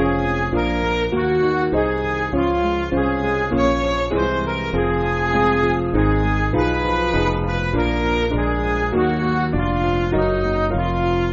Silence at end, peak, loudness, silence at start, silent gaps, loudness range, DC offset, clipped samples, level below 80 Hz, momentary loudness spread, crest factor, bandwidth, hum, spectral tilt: 0 s; -4 dBFS; -20 LUFS; 0 s; none; 1 LU; under 0.1%; under 0.1%; -28 dBFS; 2 LU; 14 dB; 7.6 kHz; none; -5.5 dB/octave